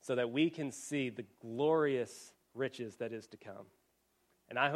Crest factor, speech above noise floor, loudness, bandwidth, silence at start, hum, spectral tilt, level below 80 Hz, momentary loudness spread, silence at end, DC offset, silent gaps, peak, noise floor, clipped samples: 22 dB; 40 dB; -36 LUFS; 14 kHz; 0.05 s; none; -5 dB/octave; -82 dBFS; 20 LU; 0 s; under 0.1%; none; -16 dBFS; -77 dBFS; under 0.1%